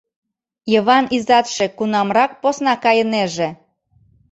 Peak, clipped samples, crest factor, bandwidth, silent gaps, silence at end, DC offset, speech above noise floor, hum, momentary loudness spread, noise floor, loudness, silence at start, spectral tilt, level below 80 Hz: 0 dBFS; under 0.1%; 16 dB; 8.2 kHz; none; 0.75 s; under 0.1%; 41 dB; none; 7 LU; -57 dBFS; -17 LUFS; 0.65 s; -4 dB/octave; -60 dBFS